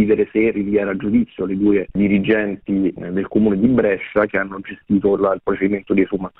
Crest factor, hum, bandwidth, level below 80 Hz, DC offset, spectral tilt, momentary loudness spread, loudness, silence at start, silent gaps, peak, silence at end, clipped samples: 14 dB; none; 4 kHz; -46 dBFS; under 0.1%; -11 dB/octave; 6 LU; -18 LUFS; 0 s; none; -2 dBFS; 0.1 s; under 0.1%